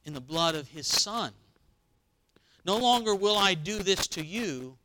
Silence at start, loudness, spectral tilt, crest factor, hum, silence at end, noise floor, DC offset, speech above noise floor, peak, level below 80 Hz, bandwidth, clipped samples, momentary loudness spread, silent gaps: 0.05 s; -27 LUFS; -2.5 dB/octave; 22 dB; none; 0.1 s; -71 dBFS; under 0.1%; 42 dB; -8 dBFS; -56 dBFS; 19 kHz; under 0.1%; 10 LU; none